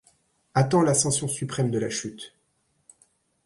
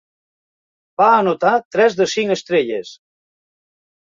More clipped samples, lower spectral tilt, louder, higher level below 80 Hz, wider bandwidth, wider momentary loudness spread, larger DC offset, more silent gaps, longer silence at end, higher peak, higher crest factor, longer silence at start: neither; about the same, -4.5 dB/octave vs -4.5 dB/octave; second, -24 LUFS vs -16 LUFS; about the same, -60 dBFS vs -64 dBFS; first, 11.5 kHz vs 7.6 kHz; first, 17 LU vs 10 LU; neither; second, none vs 1.65-1.71 s; about the same, 1.2 s vs 1.2 s; second, -8 dBFS vs -2 dBFS; about the same, 20 dB vs 18 dB; second, 0.55 s vs 1 s